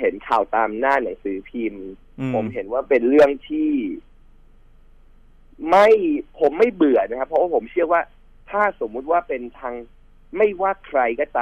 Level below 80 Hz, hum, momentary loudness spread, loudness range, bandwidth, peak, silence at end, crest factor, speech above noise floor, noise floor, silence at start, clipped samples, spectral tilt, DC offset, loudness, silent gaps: -48 dBFS; none; 16 LU; 4 LU; 9 kHz; -6 dBFS; 0 s; 14 dB; 29 dB; -48 dBFS; 0 s; under 0.1%; -7 dB/octave; under 0.1%; -20 LUFS; none